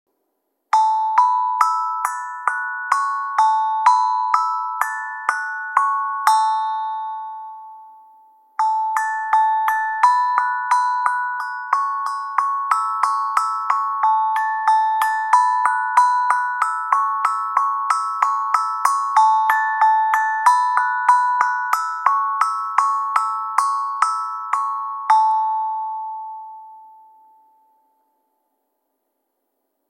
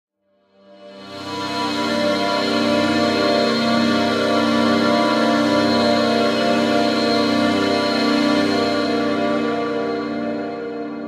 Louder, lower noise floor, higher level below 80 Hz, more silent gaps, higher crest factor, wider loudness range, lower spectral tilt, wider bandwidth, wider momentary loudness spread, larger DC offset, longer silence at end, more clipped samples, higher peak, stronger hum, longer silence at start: about the same, -19 LUFS vs -18 LUFS; first, -74 dBFS vs -61 dBFS; second, -82 dBFS vs -60 dBFS; neither; about the same, 18 dB vs 14 dB; about the same, 5 LU vs 3 LU; second, 3 dB/octave vs -4.5 dB/octave; about the same, 14.5 kHz vs 14.5 kHz; about the same, 8 LU vs 8 LU; neither; first, 3 s vs 0 s; neither; about the same, -2 dBFS vs -4 dBFS; neither; about the same, 0.75 s vs 0.8 s